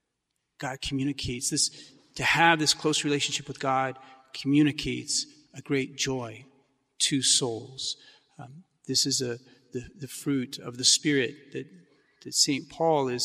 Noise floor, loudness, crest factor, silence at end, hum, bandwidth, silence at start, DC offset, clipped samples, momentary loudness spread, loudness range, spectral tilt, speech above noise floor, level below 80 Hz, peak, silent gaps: -81 dBFS; -26 LUFS; 22 dB; 0 s; none; 15.5 kHz; 0.6 s; under 0.1%; under 0.1%; 19 LU; 4 LU; -2.5 dB/octave; 53 dB; -58 dBFS; -6 dBFS; none